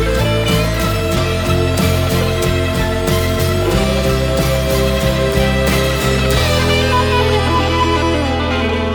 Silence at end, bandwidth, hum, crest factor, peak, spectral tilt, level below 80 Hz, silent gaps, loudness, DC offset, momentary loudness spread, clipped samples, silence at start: 0 s; over 20 kHz; none; 14 dB; 0 dBFS; -5 dB/octave; -22 dBFS; none; -15 LUFS; under 0.1%; 3 LU; under 0.1%; 0 s